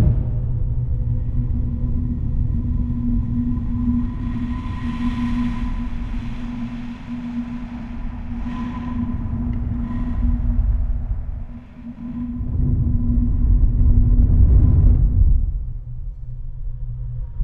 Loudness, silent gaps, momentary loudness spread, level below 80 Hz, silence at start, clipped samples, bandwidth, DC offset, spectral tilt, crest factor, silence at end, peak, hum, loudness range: -23 LUFS; none; 14 LU; -20 dBFS; 0 s; under 0.1%; 4.3 kHz; under 0.1%; -10 dB/octave; 16 dB; 0 s; -4 dBFS; none; 9 LU